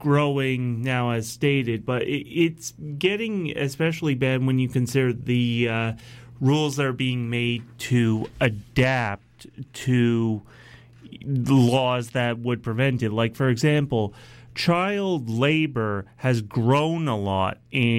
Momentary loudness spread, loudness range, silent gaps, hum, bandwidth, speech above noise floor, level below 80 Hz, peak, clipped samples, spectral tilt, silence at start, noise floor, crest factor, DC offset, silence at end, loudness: 7 LU; 2 LU; none; none; 15.5 kHz; 23 dB; -54 dBFS; -8 dBFS; under 0.1%; -6.5 dB/octave; 0 s; -46 dBFS; 16 dB; under 0.1%; 0 s; -23 LUFS